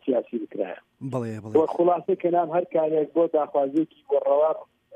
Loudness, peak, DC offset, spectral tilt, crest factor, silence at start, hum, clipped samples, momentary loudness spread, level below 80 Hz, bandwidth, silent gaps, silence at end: -24 LUFS; -8 dBFS; under 0.1%; -9 dB/octave; 16 dB; 0.05 s; none; under 0.1%; 10 LU; -76 dBFS; 9 kHz; none; 0 s